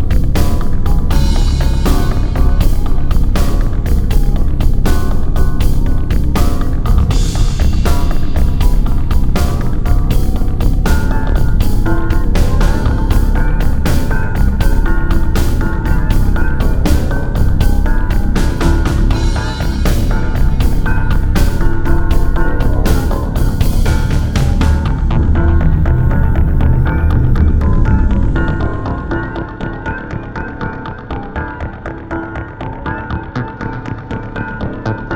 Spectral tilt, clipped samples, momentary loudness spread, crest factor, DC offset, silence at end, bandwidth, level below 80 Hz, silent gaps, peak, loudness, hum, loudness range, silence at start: -6.5 dB/octave; under 0.1%; 9 LU; 10 dB; under 0.1%; 0 s; 19 kHz; -12 dBFS; none; 0 dBFS; -16 LUFS; none; 8 LU; 0 s